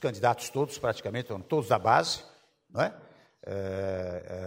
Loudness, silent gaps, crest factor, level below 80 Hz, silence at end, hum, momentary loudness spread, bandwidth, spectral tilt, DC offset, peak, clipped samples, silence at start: -30 LUFS; none; 22 dB; -64 dBFS; 0 s; none; 12 LU; 16 kHz; -4.5 dB/octave; under 0.1%; -8 dBFS; under 0.1%; 0 s